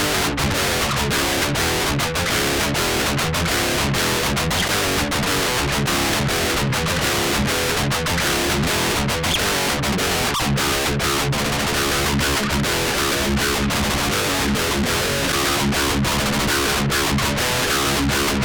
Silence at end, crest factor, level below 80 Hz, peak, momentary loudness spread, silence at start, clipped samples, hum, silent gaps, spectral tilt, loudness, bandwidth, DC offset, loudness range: 0 s; 12 dB; -32 dBFS; -8 dBFS; 1 LU; 0 s; under 0.1%; none; none; -3 dB/octave; -19 LUFS; over 20 kHz; under 0.1%; 0 LU